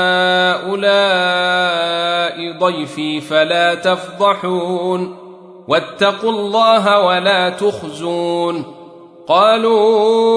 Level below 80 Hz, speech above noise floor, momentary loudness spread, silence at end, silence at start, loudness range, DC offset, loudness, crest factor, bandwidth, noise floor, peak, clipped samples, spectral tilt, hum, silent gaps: -64 dBFS; 24 dB; 9 LU; 0 s; 0 s; 2 LU; under 0.1%; -15 LUFS; 14 dB; 11 kHz; -38 dBFS; 0 dBFS; under 0.1%; -4.5 dB/octave; none; none